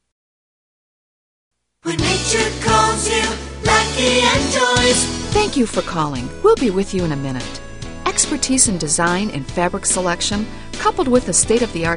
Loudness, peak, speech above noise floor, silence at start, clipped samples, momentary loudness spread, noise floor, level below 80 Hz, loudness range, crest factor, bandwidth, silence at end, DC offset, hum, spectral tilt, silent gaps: -17 LUFS; 0 dBFS; over 72 dB; 1.85 s; under 0.1%; 10 LU; under -90 dBFS; -34 dBFS; 4 LU; 18 dB; 11 kHz; 0 s; under 0.1%; none; -3 dB/octave; none